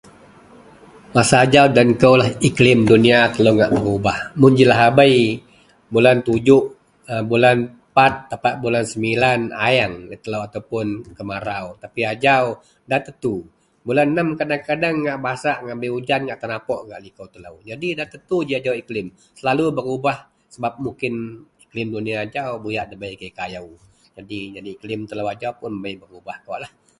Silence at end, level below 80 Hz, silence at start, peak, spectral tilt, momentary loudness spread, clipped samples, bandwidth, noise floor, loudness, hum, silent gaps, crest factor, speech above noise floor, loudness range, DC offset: 0.3 s; -50 dBFS; 1.15 s; 0 dBFS; -5.5 dB/octave; 19 LU; under 0.1%; 11.5 kHz; -46 dBFS; -18 LUFS; none; none; 18 dB; 28 dB; 14 LU; under 0.1%